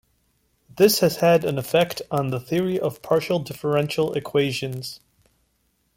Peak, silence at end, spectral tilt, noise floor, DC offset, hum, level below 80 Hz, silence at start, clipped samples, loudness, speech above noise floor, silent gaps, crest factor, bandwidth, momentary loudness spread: -4 dBFS; 1 s; -5 dB/octave; -68 dBFS; under 0.1%; none; -60 dBFS; 0.75 s; under 0.1%; -22 LUFS; 47 dB; none; 18 dB; 16.5 kHz; 9 LU